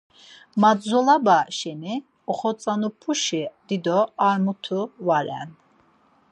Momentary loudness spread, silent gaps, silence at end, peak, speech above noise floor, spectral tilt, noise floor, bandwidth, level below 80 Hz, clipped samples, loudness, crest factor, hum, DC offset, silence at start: 13 LU; none; 0.8 s; -4 dBFS; 38 dB; -4.5 dB/octave; -60 dBFS; 9.4 kHz; -76 dBFS; under 0.1%; -23 LUFS; 18 dB; none; under 0.1%; 0.55 s